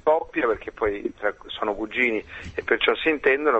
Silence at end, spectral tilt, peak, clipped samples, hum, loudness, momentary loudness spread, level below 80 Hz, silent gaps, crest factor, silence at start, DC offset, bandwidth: 0 s; -5.5 dB/octave; -4 dBFS; under 0.1%; none; -24 LUFS; 9 LU; -50 dBFS; none; 20 dB; 0.05 s; under 0.1%; 8 kHz